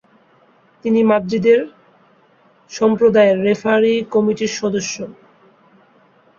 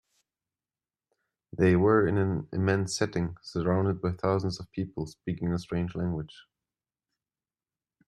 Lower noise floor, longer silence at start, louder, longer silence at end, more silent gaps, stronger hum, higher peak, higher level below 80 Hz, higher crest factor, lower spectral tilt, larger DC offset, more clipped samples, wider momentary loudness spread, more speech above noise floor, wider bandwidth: second, -53 dBFS vs under -90 dBFS; second, 0.85 s vs 1.55 s; first, -16 LUFS vs -29 LUFS; second, 1.25 s vs 1.65 s; neither; neither; first, -2 dBFS vs -10 dBFS; about the same, -60 dBFS vs -56 dBFS; about the same, 16 dB vs 20 dB; second, -5 dB/octave vs -6.5 dB/octave; neither; neither; about the same, 14 LU vs 13 LU; second, 38 dB vs over 62 dB; second, 7.6 kHz vs 11.5 kHz